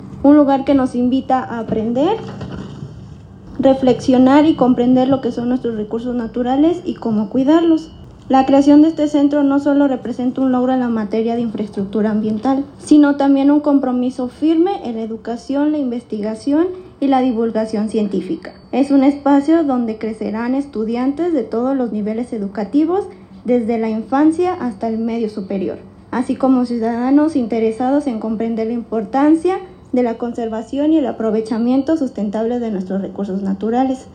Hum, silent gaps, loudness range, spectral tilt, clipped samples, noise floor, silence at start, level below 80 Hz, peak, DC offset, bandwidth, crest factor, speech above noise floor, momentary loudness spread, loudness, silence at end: none; none; 5 LU; -7.5 dB/octave; under 0.1%; -36 dBFS; 0 s; -48 dBFS; 0 dBFS; under 0.1%; 9.4 kHz; 16 dB; 20 dB; 10 LU; -16 LUFS; 0 s